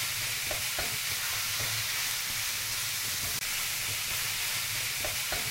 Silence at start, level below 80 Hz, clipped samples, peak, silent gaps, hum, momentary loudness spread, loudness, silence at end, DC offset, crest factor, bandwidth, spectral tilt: 0 s; -54 dBFS; under 0.1%; -16 dBFS; none; none; 1 LU; -29 LUFS; 0 s; under 0.1%; 16 dB; 16 kHz; 0 dB/octave